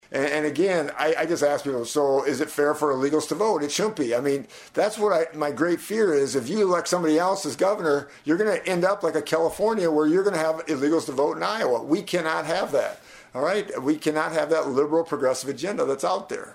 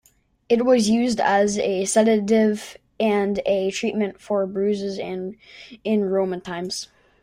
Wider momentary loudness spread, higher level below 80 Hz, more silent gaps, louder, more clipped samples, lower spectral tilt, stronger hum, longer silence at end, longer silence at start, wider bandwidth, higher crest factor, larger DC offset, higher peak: second, 5 LU vs 13 LU; second, -66 dBFS vs -60 dBFS; neither; about the same, -24 LUFS vs -22 LUFS; neither; about the same, -4.5 dB/octave vs -4.5 dB/octave; neither; second, 0 s vs 0.35 s; second, 0.1 s vs 0.5 s; about the same, 16 kHz vs 15 kHz; about the same, 16 dB vs 16 dB; neither; about the same, -8 dBFS vs -6 dBFS